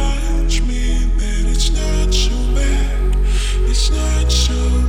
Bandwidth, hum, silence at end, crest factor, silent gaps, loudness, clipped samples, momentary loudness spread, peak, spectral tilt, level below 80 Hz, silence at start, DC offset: 12 kHz; none; 0 s; 10 dB; none; -18 LUFS; under 0.1%; 4 LU; -4 dBFS; -4.5 dB/octave; -14 dBFS; 0 s; under 0.1%